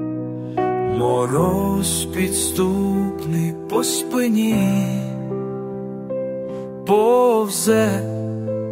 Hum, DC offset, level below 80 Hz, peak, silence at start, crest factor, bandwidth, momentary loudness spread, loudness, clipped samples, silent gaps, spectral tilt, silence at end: none; under 0.1%; -46 dBFS; -4 dBFS; 0 s; 16 dB; 16.5 kHz; 11 LU; -20 LUFS; under 0.1%; none; -5 dB/octave; 0 s